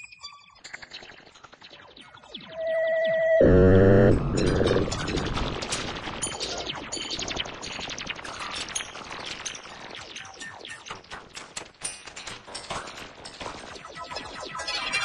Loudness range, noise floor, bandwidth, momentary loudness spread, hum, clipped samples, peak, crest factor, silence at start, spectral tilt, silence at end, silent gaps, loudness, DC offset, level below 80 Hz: 16 LU; -50 dBFS; 11.5 kHz; 22 LU; none; under 0.1%; -8 dBFS; 20 dB; 0 s; -5 dB/octave; 0 s; none; -26 LUFS; under 0.1%; -40 dBFS